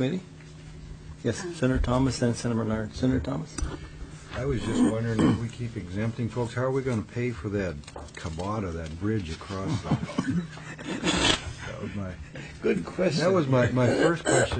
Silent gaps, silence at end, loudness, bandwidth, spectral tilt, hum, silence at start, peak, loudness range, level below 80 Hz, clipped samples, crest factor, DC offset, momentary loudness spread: none; 0 s; -28 LUFS; 9.4 kHz; -5.5 dB/octave; none; 0 s; -2 dBFS; 5 LU; -42 dBFS; under 0.1%; 24 dB; under 0.1%; 16 LU